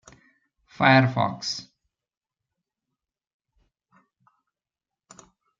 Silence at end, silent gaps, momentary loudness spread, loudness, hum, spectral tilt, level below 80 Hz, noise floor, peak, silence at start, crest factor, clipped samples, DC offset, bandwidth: 3.95 s; none; 13 LU; -22 LUFS; none; -5.5 dB/octave; -66 dBFS; under -90 dBFS; -4 dBFS; 0.8 s; 24 dB; under 0.1%; under 0.1%; 7.6 kHz